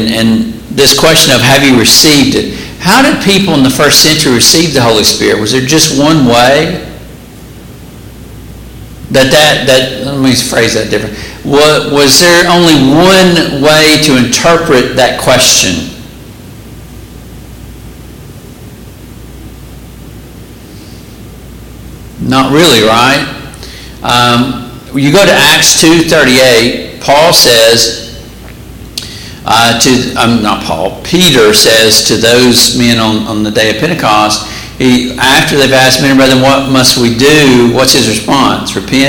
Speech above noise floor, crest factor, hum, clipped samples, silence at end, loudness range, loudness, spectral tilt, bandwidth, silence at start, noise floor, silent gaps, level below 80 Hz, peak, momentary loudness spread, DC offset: 23 dB; 8 dB; none; 0.6%; 0 s; 6 LU; -5 LUFS; -3 dB/octave; over 20 kHz; 0 s; -29 dBFS; none; -32 dBFS; 0 dBFS; 11 LU; under 0.1%